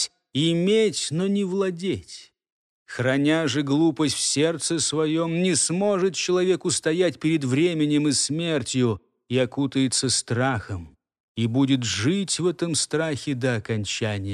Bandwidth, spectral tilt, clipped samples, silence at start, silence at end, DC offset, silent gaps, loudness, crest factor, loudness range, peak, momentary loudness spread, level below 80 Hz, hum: 13 kHz; -4.5 dB/octave; under 0.1%; 0 s; 0 s; under 0.1%; 2.52-2.86 s, 11.20-11.35 s; -23 LUFS; 14 dB; 3 LU; -8 dBFS; 6 LU; -60 dBFS; none